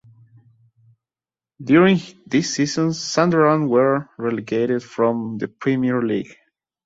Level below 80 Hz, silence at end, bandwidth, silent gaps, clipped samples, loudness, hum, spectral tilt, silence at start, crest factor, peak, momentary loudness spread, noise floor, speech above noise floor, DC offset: -62 dBFS; 0.55 s; 7.8 kHz; none; under 0.1%; -19 LUFS; none; -5.5 dB/octave; 1.6 s; 18 dB; -2 dBFS; 10 LU; under -90 dBFS; over 71 dB; under 0.1%